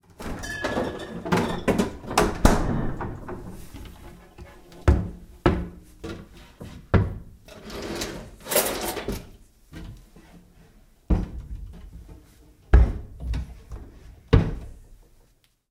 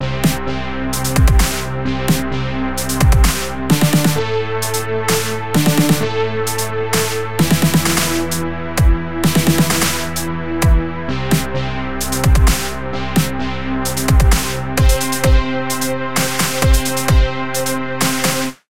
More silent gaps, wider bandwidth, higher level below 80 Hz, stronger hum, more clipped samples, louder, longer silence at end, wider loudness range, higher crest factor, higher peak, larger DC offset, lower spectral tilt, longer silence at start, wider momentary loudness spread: neither; about the same, 16.5 kHz vs 17 kHz; second, -30 dBFS vs -20 dBFS; neither; neither; second, -26 LUFS vs -17 LUFS; first, 0.75 s vs 0.05 s; first, 5 LU vs 2 LU; first, 26 dB vs 14 dB; about the same, -2 dBFS vs 0 dBFS; second, under 0.1% vs 5%; about the same, -5.5 dB/octave vs -4.5 dB/octave; first, 0.2 s vs 0 s; first, 23 LU vs 7 LU